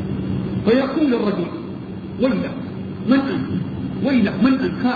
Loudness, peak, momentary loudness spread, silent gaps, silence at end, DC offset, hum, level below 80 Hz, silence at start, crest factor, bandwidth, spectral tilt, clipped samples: -20 LUFS; -4 dBFS; 12 LU; none; 0 s; under 0.1%; none; -46 dBFS; 0 s; 16 dB; 4.9 kHz; -9.5 dB/octave; under 0.1%